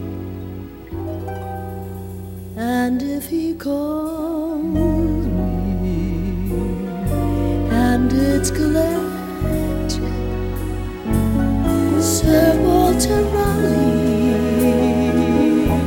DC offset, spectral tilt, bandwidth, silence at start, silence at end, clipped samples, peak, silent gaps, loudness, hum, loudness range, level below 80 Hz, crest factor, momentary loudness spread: under 0.1%; -6 dB/octave; 17.5 kHz; 0 s; 0 s; under 0.1%; -2 dBFS; none; -19 LUFS; none; 8 LU; -28 dBFS; 16 dB; 13 LU